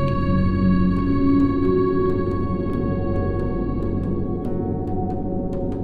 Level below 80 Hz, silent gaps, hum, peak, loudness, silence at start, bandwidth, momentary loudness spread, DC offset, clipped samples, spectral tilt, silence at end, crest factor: -30 dBFS; none; none; -8 dBFS; -22 LUFS; 0 s; 4.8 kHz; 7 LU; under 0.1%; under 0.1%; -10.5 dB/octave; 0 s; 14 dB